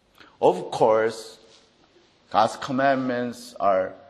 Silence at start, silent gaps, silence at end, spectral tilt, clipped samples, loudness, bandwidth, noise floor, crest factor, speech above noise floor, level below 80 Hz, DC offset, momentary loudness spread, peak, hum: 0.4 s; none; 0.15 s; -5 dB/octave; under 0.1%; -23 LUFS; 12.5 kHz; -59 dBFS; 20 dB; 36 dB; -68 dBFS; under 0.1%; 9 LU; -4 dBFS; none